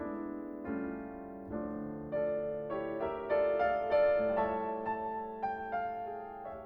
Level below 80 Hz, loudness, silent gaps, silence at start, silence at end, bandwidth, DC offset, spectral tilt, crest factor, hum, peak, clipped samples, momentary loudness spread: -62 dBFS; -35 LUFS; none; 0 s; 0 s; 5.4 kHz; under 0.1%; -9 dB/octave; 16 dB; none; -18 dBFS; under 0.1%; 13 LU